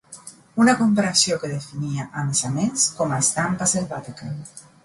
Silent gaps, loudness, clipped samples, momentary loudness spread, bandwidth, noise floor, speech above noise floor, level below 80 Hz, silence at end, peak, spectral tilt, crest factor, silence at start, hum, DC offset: none; -21 LUFS; under 0.1%; 16 LU; 11.5 kHz; -44 dBFS; 22 dB; -58 dBFS; 0.25 s; -4 dBFS; -3.5 dB/octave; 18 dB; 0.1 s; none; under 0.1%